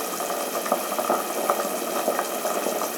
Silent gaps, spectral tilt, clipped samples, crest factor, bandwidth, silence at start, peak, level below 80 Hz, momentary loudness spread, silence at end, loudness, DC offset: none; -2 dB/octave; under 0.1%; 22 dB; over 20 kHz; 0 s; -4 dBFS; under -90 dBFS; 2 LU; 0 s; -25 LUFS; under 0.1%